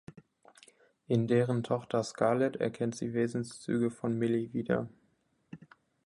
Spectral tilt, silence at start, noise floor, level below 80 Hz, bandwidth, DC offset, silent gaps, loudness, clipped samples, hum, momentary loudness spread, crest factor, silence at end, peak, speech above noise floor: -7 dB/octave; 0.1 s; -73 dBFS; -70 dBFS; 11.5 kHz; under 0.1%; none; -32 LUFS; under 0.1%; none; 8 LU; 20 dB; 0.5 s; -12 dBFS; 42 dB